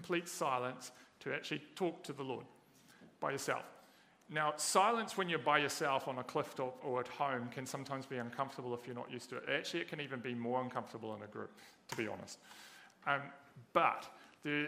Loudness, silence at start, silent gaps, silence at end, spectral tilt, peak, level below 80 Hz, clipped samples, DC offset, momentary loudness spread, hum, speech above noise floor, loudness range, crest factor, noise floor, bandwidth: -39 LUFS; 0 s; none; 0 s; -3.5 dB/octave; -14 dBFS; -86 dBFS; under 0.1%; under 0.1%; 17 LU; none; 26 dB; 7 LU; 26 dB; -65 dBFS; 15.5 kHz